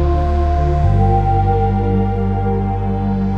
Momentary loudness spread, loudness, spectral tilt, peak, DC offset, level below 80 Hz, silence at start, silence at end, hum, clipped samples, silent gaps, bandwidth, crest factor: 4 LU; -16 LUFS; -10 dB/octave; -4 dBFS; under 0.1%; -20 dBFS; 0 s; 0 s; none; under 0.1%; none; 5.6 kHz; 10 dB